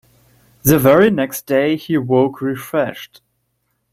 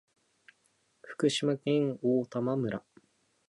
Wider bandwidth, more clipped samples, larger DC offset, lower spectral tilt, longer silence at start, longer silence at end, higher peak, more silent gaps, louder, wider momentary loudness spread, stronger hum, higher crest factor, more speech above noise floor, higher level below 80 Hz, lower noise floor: first, 16.5 kHz vs 11.5 kHz; neither; neither; about the same, -6 dB/octave vs -5.5 dB/octave; second, 0.65 s vs 1.05 s; first, 0.9 s vs 0.7 s; first, 0 dBFS vs -14 dBFS; neither; first, -16 LUFS vs -31 LUFS; about the same, 10 LU vs 8 LU; neither; about the same, 16 dB vs 18 dB; first, 53 dB vs 43 dB; first, -50 dBFS vs -76 dBFS; about the same, -69 dBFS vs -72 dBFS